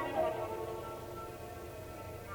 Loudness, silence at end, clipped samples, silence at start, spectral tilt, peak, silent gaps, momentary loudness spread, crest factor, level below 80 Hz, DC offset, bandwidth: -41 LUFS; 0 s; under 0.1%; 0 s; -5.5 dB/octave; -22 dBFS; none; 11 LU; 18 dB; -58 dBFS; under 0.1%; 19.5 kHz